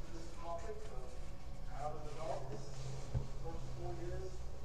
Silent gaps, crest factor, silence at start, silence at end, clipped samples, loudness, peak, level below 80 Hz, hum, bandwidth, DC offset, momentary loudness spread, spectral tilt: none; 18 dB; 0 s; 0 s; under 0.1%; -47 LUFS; -26 dBFS; -48 dBFS; none; 11 kHz; 0.7%; 7 LU; -6 dB/octave